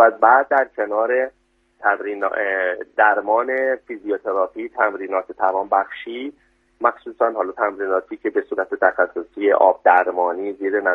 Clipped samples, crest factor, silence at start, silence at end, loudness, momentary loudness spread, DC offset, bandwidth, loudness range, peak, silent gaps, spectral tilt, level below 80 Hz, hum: under 0.1%; 18 dB; 0 s; 0 s; -20 LUFS; 10 LU; under 0.1%; 3.9 kHz; 4 LU; 0 dBFS; none; -6 dB/octave; -66 dBFS; none